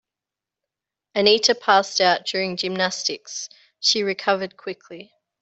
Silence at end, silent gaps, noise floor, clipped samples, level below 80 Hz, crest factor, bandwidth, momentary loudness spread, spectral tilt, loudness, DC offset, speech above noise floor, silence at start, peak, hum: 0.4 s; none; -88 dBFS; under 0.1%; -70 dBFS; 20 dB; 8.2 kHz; 16 LU; -2 dB/octave; -20 LUFS; under 0.1%; 66 dB; 1.15 s; -2 dBFS; none